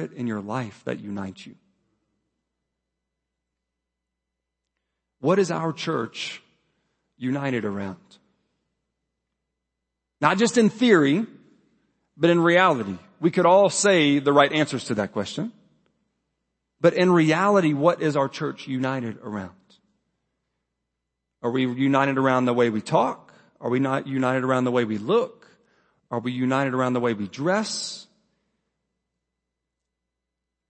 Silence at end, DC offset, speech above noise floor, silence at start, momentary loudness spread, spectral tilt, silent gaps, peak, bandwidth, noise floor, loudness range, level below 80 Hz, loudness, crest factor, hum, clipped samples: 2.65 s; under 0.1%; 62 dB; 0 s; 15 LU; -5 dB/octave; none; -2 dBFS; 8.8 kHz; -84 dBFS; 13 LU; -72 dBFS; -22 LUFS; 22 dB; none; under 0.1%